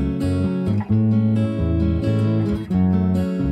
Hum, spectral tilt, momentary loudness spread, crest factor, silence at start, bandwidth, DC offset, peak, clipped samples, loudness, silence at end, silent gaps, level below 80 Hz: none; -9.5 dB/octave; 3 LU; 10 dB; 0 s; 9 kHz; under 0.1%; -8 dBFS; under 0.1%; -20 LUFS; 0 s; none; -34 dBFS